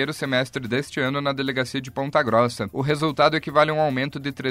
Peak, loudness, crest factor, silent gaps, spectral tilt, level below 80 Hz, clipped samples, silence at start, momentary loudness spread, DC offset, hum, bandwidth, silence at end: -4 dBFS; -23 LUFS; 20 dB; none; -5.5 dB/octave; -56 dBFS; under 0.1%; 0 s; 7 LU; under 0.1%; none; 16 kHz; 0 s